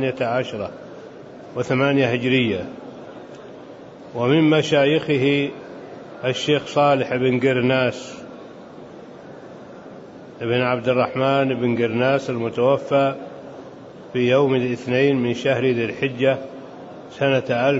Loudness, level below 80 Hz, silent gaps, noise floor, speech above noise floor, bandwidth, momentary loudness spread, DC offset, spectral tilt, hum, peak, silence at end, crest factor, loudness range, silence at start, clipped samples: -20 LUFS; -62 dBFS; none; -39 dBFS; 20 dB; 8 kHz; 22 LU; under 0.1%; -6.5 dB/octave; none; -4 dBFS; 0 s; 16 dB; 4 LU; 0 s; under 0.1%